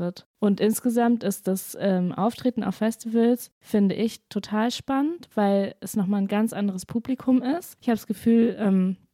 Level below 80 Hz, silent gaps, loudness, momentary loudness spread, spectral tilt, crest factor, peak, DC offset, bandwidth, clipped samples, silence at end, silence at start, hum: -66 dBFS; 0.26-0.34 s, 3.52-3.61 s; -25 LUFS; 7 LU; -6.5 dB/octave; 12 dB; -12 dBFS; under 0.1%; 16 kHz; under 0.1%; 0.2 s; 0 s; none